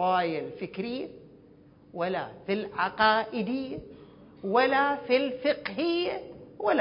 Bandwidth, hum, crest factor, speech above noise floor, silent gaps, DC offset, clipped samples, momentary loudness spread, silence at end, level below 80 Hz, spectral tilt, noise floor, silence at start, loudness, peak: 5.4 kHz; none; 20 dB; 27 dB; none; under 0.1%; under 0.1%; 15 LU; 0 s; -64 dBFS; -9 dB/octave; -55 dBFS; 0 s; -28 LUFS; -10 dBFS